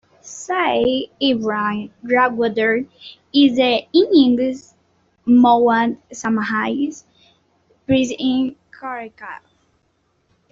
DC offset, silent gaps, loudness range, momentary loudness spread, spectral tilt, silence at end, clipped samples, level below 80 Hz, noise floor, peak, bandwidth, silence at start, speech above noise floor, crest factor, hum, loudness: under 0.1%; none; 8 LU; 20 LU; -4.5 dB/octave; 1.15 s; under 0.1%; -58 dBFS; -65 dBFS; -2 dBFS; 7.8 kHz; 0.25 s; 47 dB; 16 dB; none; -17 LUFS